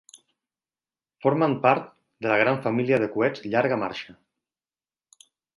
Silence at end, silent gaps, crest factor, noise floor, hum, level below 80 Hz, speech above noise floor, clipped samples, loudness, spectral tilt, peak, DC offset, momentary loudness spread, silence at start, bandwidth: 1.45 s; none; 22 dB; under -90 dBFS; none; -68 dBFS; over 67 dB; under 0.1%; -24 LUFS; -7 dB/octave; -4 dBFS; under 0.1%; 11 LU; 0.15 s; 11.5 kHz